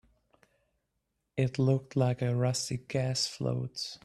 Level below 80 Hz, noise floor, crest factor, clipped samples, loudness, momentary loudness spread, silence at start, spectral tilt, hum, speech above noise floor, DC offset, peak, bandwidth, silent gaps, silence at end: -64 dBFS; -82 dBFS; 18 dB; under 0.1%; -31 LUFS; 6 LU; 1.35 s; -5.5 dB/octave; none; 51 dB; under 0.1%; -14 dBFS; 12.5 kHz; none; 0.1 s